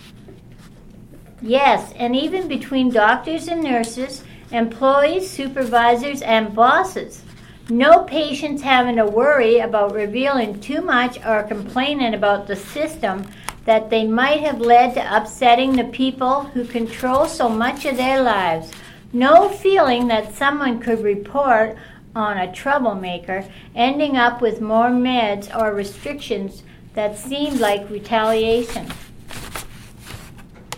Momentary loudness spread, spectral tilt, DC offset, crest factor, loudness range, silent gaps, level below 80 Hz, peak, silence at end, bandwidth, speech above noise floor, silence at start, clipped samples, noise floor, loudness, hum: 14 LU; -4.5 dB/octave; under 0.1%; 18 dB; 5 LU; none; -46 dBFS; 0 dBFS; 0 s; 16.5 kHz; 24 dB; 0.05 s; under 0.1%; -42 dBFS; -18 LUFS; none